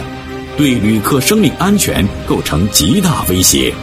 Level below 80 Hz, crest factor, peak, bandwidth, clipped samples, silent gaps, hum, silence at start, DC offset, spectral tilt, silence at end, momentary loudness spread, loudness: -28 dBFS; 12 dB; 0 dBFS; over 20 kHz; under 0.1%; none; none; 0 s; under 0.1%; -4 dB/octave; 0 s; 7 LU; -12 LUFS